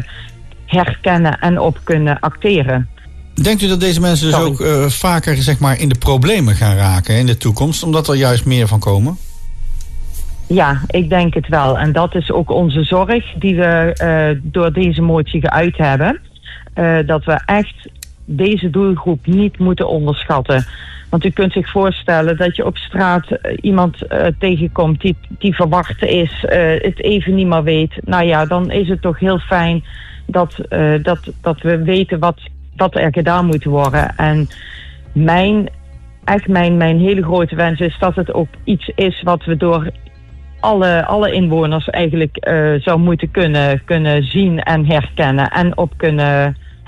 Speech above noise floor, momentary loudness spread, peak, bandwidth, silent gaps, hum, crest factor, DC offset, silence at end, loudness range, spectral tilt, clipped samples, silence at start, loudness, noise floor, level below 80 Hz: 21 dB; 7 LU; -2 dBFS; 13.5 kHz; none; none; 12 dB; under 0.1%; 0.15 s; 3 LU; -6.5 dB/octave; under 0.1%; 0 s; -14 LUFS; -34 dBFS; -30 dBFS